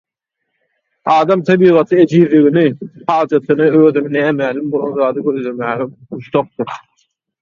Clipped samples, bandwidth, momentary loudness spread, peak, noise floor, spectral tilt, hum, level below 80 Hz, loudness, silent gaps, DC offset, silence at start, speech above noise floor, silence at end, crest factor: under 0.1%; 7.2 kHz; 14 LU; 0 dBFS; -75 dBFS; -8 dB/octave; none; -60 dBFS; -13 LUFS; none; under 0.1%; 1.05 s; 62 dB; 0.65 s; 14 dB